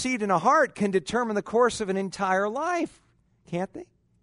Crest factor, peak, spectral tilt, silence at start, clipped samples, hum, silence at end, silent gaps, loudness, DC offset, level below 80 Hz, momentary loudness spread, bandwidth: 18 dB; -8 dBFS; -5 dB/octave; 0 s; under 0.1%; none; 0.4 s; none; -25 LUFS; under 0.1%; -60 dBFS; 13 LU; 11 kHz